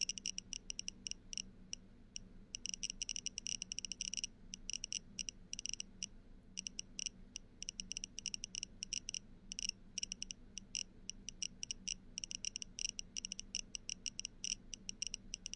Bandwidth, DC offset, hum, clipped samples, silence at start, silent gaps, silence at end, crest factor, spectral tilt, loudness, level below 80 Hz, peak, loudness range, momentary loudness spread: 11.5 kHz; under 0.1%; none; under 0.1%; 0 s; none; 0 s; 24 dB; 0.5 dB/octave; -45 LUFS; -60 dBFS; -24 dBFS; 2 LU; 7 LU